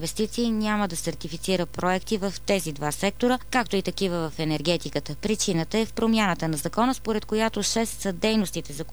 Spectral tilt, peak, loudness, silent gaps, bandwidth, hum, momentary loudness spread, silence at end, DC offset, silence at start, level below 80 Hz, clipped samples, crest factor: -4 dB/octave; -8 dBFS; -26 LUFS; none; 19.5 kHz; none; 5 LU; 0 s; 1%; 0 s; -46 dBFS; under 0.1%; 18 dB